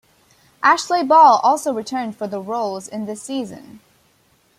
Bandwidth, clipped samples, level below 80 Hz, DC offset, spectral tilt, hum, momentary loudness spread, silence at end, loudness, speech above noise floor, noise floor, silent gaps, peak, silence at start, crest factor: 15 kHz; under 0.1%; -68 dBFS; under 0.1%; -3.5 dB/octave; none; 17 LU; 0.8 s; -18 LUFS; 41 dB; -59 dBFS; none; -2 dBFS; 0.6 s; 18 dB